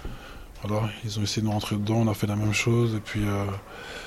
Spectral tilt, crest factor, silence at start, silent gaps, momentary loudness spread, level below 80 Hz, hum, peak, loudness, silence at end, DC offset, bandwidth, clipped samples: -5.5 dB/octave; 14 dB; 0 s; none; 15 LU; -46 dBFS; none; -12 dBFS; -27 LUFS; 0 s; under 0.1%; 15.5 kHz; under 0.1%